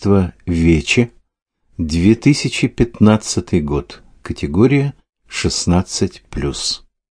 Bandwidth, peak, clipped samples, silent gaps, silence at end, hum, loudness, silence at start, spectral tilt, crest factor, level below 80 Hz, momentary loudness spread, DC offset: 10.5 kHz; 0 dBFS; under 0.1%; 1.42-1.46 s; 0.4 s; none; -16 LUFS; 0 s; -5.5 dB/octave; 16 dB; -32 dBFS; 12 LU; under 0.1%